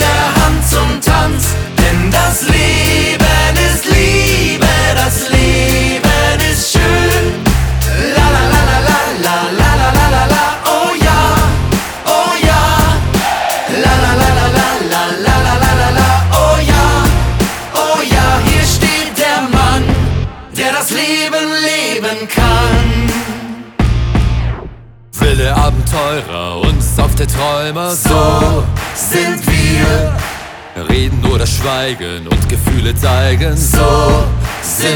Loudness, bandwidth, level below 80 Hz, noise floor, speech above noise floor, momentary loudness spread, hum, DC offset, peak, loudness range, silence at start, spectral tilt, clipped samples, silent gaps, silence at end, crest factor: -11 LUFS; over 20 kHz; -18 dBFS; -31 dBFS; 21 dB; 6 LU; none; under 0.1%; 0 dBFS; 4 LU; 0 s; -4.5 dB/octave; under 0.1%; none; 0 s; 10 dB